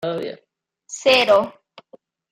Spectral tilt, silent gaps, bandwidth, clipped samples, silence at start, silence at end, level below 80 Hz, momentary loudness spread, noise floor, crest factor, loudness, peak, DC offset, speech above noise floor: -2.5 dB/octave; none; 16 kHz; under 0.1%; 0 s; 0.8 s; -68 dBFS; 19 LU; -52 dBFS; 18 dB; -17 LUFS; -2 dBFS; under 0.1%; 34 dB